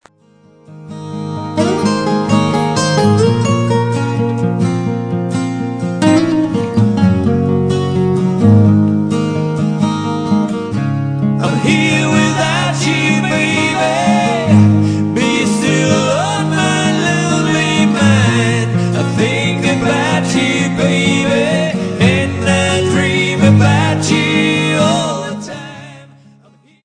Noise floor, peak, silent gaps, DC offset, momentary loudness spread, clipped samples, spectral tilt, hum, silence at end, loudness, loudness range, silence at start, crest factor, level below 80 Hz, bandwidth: -47 dBFS; 0 dBFS; none; under 0.1%; 7 LU; under 0.1%; -5.5 dB/octave; none; 0.8 s; -13 LUFS; 3 LU; 0.7 s; 14 dB; -46 dBFS; 10 kHz